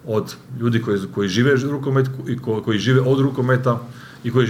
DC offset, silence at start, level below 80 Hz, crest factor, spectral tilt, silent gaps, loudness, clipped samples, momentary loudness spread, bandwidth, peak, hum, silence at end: under 0.1%; 0.05 s; -58 dBFS; 16 dB; -7 dB/octave; none; -20 LUFS; under 0.1%; 9 LU; 14.5 kHz; -4 dBFS; none; 0 s